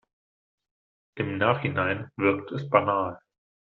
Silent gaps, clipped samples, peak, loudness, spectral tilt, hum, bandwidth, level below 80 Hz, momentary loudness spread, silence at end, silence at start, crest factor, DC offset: none; under 0.1%; -4 dBFS; -26 LUFS; -5 dB/octave; none; 6 kHz; -66 dBFS; 9 LU; 0.45 s; 1.15 s; 24 dB; under 0.1%